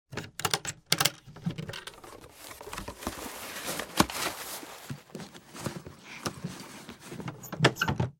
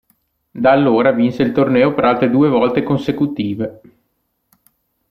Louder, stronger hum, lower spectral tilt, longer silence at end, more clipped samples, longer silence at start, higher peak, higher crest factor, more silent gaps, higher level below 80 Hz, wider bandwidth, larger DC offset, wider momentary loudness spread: second, -32 LUFS vs -15 LUFS; neither; second, -3 dB/octave vs -8.5 dB/octave; second, 0.05 s vs 1.35 s; neither; second, 0.1 s vs 0.55 s; about the same, -4 dBFS vs -2 dBFS; first, 30 dB vs 14 dB; neither; about the same, -56 dBFS vs -54 dBFS; first, 17.5 kHz vs 6.4 kHz; neither; first, 19 LU vs 8 LU